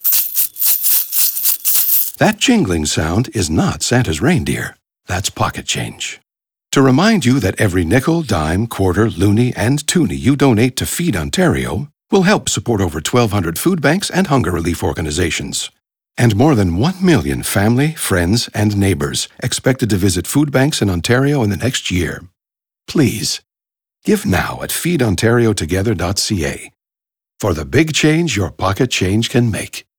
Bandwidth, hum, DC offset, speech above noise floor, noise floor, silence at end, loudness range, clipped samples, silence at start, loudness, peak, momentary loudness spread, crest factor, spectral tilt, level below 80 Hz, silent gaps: over 20 kHz; none; under 0.1%; 72 dB; -87 dBFS; 0.2 s; 4 LU; under 0.1%; 0 s; -15 LUFS; -2 dBFS; 9 LU; 14 dB; -4.5 dB/octave; -40 dBFS; none